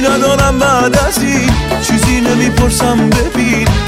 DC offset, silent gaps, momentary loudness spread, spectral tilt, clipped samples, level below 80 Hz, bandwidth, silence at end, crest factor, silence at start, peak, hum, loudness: under 0.1%; none; 2 LU; -4.5 dB/octave; under 0.1%; -20 dBFS; 16.5 kHz; 0 s; 10 dB; 0 s; 0 dBFS; none; -11 LUFS